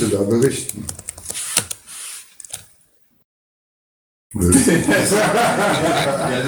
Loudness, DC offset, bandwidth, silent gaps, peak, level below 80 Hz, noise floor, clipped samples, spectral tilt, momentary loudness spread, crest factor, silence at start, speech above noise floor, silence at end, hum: -17 LUFS; under 0.1%; over 20 kHz; 3.25-4.30 s; 0 dBFS; -44 dBFS; -57 dBFS; under 0.1%; -4 dB/octave; 18 LU; 20 dB; 0 s; 40 dB; 0 s; none